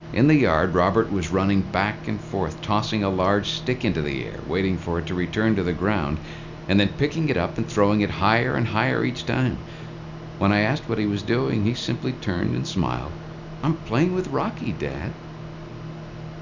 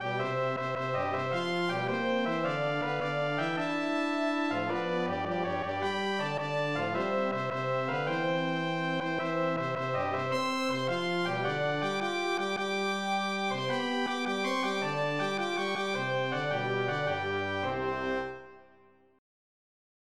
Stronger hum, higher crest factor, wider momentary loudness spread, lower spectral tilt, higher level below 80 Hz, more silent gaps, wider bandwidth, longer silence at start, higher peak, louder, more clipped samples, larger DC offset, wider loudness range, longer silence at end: neither; first, 20 dB vs 14 dB; first, 16 LU vs 2 LU; about the same, -6.5 dB/octave vs -5.5 dB/octave; first, -42 dBFS vs -70 dBFS; neither; second, 7.6 kHz vs 14 kHz; about the same, 0 s vs 0 s; first, -4 dBFS vs -18 dBFS; first, -23 LUFS vs -31 LUFS; neither; second, under 0.1% vs 0.2%; first, 4 LU vs 1 LU; second, 0 s vs 0.95 s